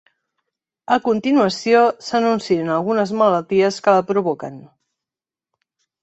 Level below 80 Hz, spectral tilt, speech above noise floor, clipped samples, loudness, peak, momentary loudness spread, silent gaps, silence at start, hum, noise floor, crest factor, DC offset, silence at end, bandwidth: -64 dBFS; -5.5 dB/octave; 73 dB; under 0.1%; -18 LUFS; -2 dBFS; 5 LU; none; 0.9 s; none; -90 dBFS; 18 dB; under 0.1%; 1.35 s; 8.2 kHz